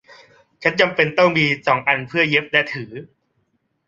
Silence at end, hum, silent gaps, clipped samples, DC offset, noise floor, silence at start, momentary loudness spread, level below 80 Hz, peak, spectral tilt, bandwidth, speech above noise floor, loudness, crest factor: 0.8 s; none; none; under 0.1%; under 0.1%; -68 dBFS; 0.6 s; 12 LU; -60 dBFS; -2 dBFS; -5.5 dB/octave; 7.6 kHz; 50 dB; -17 LUFS; 18 dB